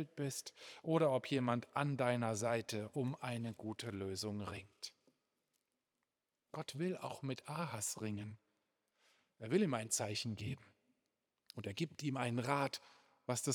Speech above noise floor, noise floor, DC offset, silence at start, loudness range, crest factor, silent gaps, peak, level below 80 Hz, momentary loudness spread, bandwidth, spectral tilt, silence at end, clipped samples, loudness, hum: 49 dB; -90 dBFS; under 0.1%; 0 s; 9 LU; 22 dB; none; -20 dBFS; -82 dBFS; 14 LU; over 20 kHz; -5 dB/octave; 0 s; under 0.1%; -40 LUFS; none